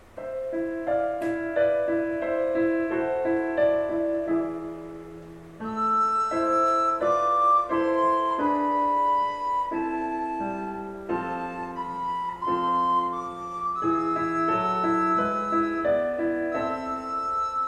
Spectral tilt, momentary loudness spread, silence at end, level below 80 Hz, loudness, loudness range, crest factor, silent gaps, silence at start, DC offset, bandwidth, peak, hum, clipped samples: -6.5 dB/octave; 10 LU; 0 s; -56 dBFS; -25 LUFS; 5 LU; 14 dB; none; 0.15 s; under 0.1%; 9.8 kHz; -12 dBFS; none; under 0.1%